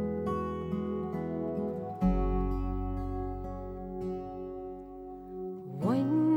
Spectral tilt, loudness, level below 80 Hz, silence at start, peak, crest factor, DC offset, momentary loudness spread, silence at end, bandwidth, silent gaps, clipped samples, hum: -10 dB/octave; -34 LUFS; -40 dBFS; 0 s; -16 dBFS; 16 dB; under 0.1%; 12 LU; 0 s; 7.8 kHz; none; under 0.1%; none